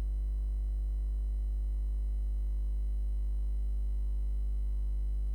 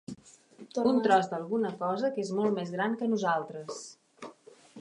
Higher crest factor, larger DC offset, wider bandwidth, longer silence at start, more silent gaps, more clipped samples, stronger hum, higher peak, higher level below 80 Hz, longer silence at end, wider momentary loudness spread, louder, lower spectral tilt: second, 4 dB vs 20 dB; neither; second, 1.1 kHz vs 11 kHz; about the same, 0 s vs 0.1 s; neither; neither; first, 50 Hz at -30 dBFS vs none; second, -28 dBFS vs -10 dBFS; first, -32 dBFS vs -78 dBFS; about the same, 0 s vs 0 s; second, 0 LU vs 22 LU; second, -36 LUFS vs -30 LUFS; first, -8.5 dB/octave vs -5.5 dB/octave